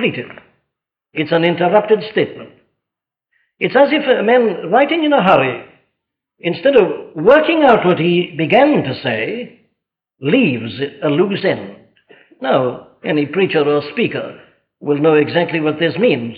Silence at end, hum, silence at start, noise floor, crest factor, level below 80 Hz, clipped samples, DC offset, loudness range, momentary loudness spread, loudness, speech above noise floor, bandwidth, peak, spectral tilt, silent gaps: 0 s; none; 0 s; -84 dBFS; 14 dB; -58 dBFS; under 0.1%; under 0.1%; 5 LU; 13 LU; -15 LUFS; 69 dB; 5.2 kHz; -2 dBFS; -8.5 dB/octave; none